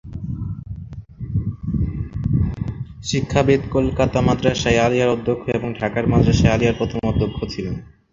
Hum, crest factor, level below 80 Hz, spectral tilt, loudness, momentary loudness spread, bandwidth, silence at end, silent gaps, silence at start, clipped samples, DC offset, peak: none; 18 dB; -32 dBFS; -6.5 dB/octave; -20 LUFS; 13 LU; 7.6 kHz; 0.3 s; none; 0.05 s; under 0.1%; under 0.1%; 0 dBFS